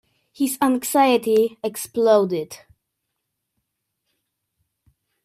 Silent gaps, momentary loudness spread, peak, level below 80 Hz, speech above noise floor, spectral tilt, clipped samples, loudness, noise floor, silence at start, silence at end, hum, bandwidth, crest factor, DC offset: none; 11 LU; -4 dBFS; -70 dBFS; 59 dB; -4 dB/octave; under 0.1%; -20 LUFS; -79 dBFS; 0.4 s; 2.7 s; none; 16 kHz; 18 dB; under 0.1%